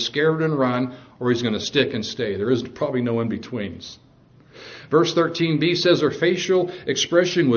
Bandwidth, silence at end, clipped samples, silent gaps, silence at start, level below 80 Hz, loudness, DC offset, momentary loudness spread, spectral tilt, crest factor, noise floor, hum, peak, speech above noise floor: 7 kHz; 0 s; under 0.1%; none; 0 s; -60 dBFS; -21 LUFS; under 0.1%; 12 LU; -5 dB/octave; 20 dB; -52 dBFS; none; -2 dBFS; 31 dB